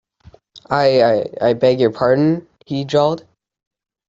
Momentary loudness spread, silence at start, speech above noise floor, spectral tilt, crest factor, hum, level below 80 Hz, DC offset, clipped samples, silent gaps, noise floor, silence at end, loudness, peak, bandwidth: 11 LU; 0.7 s; 33 dB; -7 dB/octave; 16 dB; none; -56 dBFS; under 0.1%; under 0.1%; none; -48 dBFS; 0.9 s; -16 LUFS; -2 dBFS; 7.8 kHz